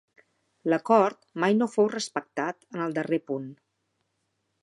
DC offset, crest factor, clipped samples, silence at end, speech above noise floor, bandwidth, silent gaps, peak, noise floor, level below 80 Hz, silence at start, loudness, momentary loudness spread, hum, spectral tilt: under 0.1%; 20 dB; under 0.1%; 1.1 s; 51 dB; 11.5 kHz; none; -8 dBFS; -77 dBFS; -82 dBFS; 0.65 s; -27 LUFS; 12 LU; none; -5.5 dB/octave